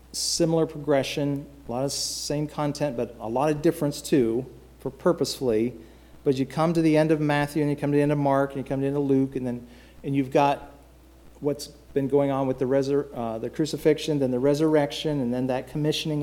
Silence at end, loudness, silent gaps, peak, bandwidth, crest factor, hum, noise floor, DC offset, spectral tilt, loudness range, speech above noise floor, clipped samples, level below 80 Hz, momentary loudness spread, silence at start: 0 s; -25 LUFS; none; -8 dBFS; 17 kHz; 18 dB; none; -51 dBFS; under 0.1%; -5.5 dB/octave; 3 LU; 27 dB; under 0.1%; -52 dBFS; 9 LU; 0.15 s